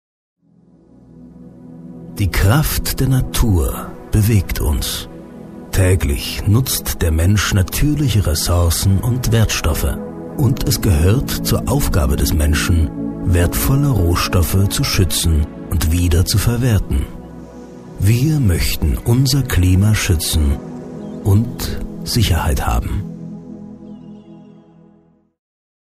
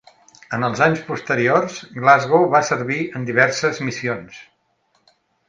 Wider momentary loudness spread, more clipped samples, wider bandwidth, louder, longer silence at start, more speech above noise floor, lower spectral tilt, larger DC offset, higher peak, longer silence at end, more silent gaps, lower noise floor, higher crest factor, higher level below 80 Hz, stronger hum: first, 17 LU vs 11 LU; neither; first, 15.5 kHz vs 9.6 kHz; about the same, -16 LUFS vs -18 LUFS; first, 1.15 s vs 0.5 s; second, 37 dB vs 46 dB; about the same, -5 dB/octave vs -5 dB/octave; neither; about the same, 0 dBFS vs 0 dBFS; first, 1.55 s vs 1.05 s; neither; second, -52 dBFS vs -65 dBFS; about the same, 16 dB vs 20 dB; first, -24 dBFS vs -62 dBFS; neither